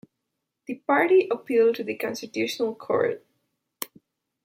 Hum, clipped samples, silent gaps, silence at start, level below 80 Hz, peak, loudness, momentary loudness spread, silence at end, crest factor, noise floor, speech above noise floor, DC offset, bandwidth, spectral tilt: none; under 0.1%; none; 0.7 s; -78 dBFS; -8 dBFS; -24 LUFS; 17 LU; 0.6 s; 18 dB; -82 dBFS; 58 dB; under 0.1%; 16.5 kHz; -4.5 dB/octave